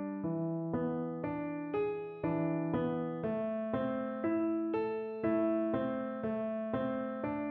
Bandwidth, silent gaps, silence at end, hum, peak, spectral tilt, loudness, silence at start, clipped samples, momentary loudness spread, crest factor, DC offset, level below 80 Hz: 4.3 kHz; none; 0 s; none; -22 dBFS; -8 dB/octave; -35 LUFS; 0 s; under 0.1%; 5 LU; 14 dB; under 0.1%; -66 dBFS